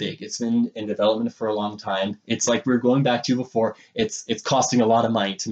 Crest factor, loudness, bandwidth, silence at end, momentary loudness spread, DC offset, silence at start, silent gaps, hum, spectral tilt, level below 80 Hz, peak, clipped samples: 16 dB; -22 LUFS; 8.8 kHz; 0 s; 7 LU; under 0.1%; 0 s; none; none; -4.5 dB/octave; -64 dBFS; -6 dBFS; under 0.1%